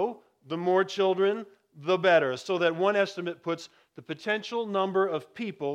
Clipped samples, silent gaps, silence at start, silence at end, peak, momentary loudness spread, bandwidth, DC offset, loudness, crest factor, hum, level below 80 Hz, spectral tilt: under 0.1%; none; 0 s; 0 s; -10 dBFS; 14 LU; 9.4 kHz; under 0.1%; -28 LUFS; 18 dB; none; -84 dBFS; -5.5 dB/octave